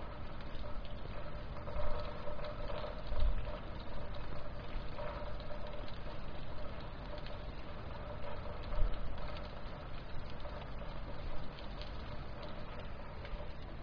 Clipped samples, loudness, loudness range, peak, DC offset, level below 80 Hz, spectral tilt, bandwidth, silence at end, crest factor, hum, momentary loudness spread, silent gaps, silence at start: under 0.1%; -46 LUFS; 4 LU; -18 dBFS; under 0.1%; -42 dBFS; -7.5 dB/octave; 5.4 kHz; 0 s; 20 dB; none; 6 LU; none; 0 s